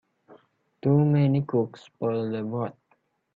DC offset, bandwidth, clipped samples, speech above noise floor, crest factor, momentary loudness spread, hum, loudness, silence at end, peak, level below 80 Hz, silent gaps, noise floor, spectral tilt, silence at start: under 0.1%; 4.7 kHz; under 0.1%; 45 dB; 16 dB; 11 LU; none; -26 LUFS; 0.65 s; -10 dBFS; -68 dBFS; none; -69 dBFS; -10.5 dB/octave; 0.85 s